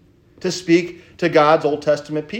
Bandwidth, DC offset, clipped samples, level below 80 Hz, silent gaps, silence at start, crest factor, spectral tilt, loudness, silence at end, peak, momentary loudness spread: 9.6 kHz; under 0.1%; under 0.1%; -60 dBFS; none; 0.45 s; 16 dB; -5.5 dB/octave; -18 LUFS; 0 s; -2 dBFS; 12 LU